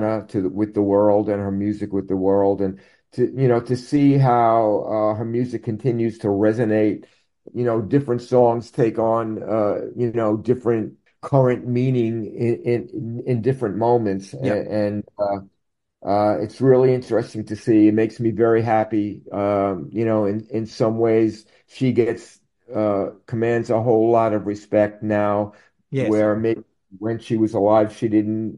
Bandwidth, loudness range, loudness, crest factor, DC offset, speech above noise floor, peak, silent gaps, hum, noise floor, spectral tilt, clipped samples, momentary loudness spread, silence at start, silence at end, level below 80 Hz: 11 kHz; 3 LU; -20 LUFS; 18 dB; under 0.1%; 57 dB; -2 dBFS; none; none; -76 dBFS; -8.5 dB/octave; under 0.1%; 9 LU; 0 s; 0 s; -60 dBFS